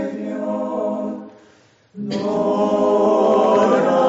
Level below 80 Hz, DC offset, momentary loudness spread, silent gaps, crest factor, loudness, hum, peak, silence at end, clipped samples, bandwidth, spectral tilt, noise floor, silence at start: -62 dBFS; under 0.1%; 12 LU; none; 14 dB; -18 LUFS; none; -4 dBFS; 0 s; under 0.1%; 8 kHz; -5.5 dB/octave; -53 dBFS; 0 s